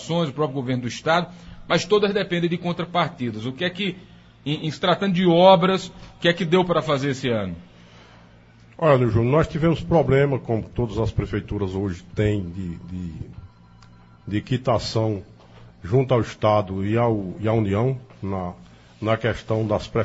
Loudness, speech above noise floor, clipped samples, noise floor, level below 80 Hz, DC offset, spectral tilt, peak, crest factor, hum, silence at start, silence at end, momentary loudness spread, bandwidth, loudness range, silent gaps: -22 LUFS; 28 dB; under 0.1%; -50 dBFS; -44 dBFS; under 0.1%; -6.5 dB/octave; 0 dBFS; 22 dB; none; 0 s; 0 s; 14 LU; 8 kHz; 8 LU; none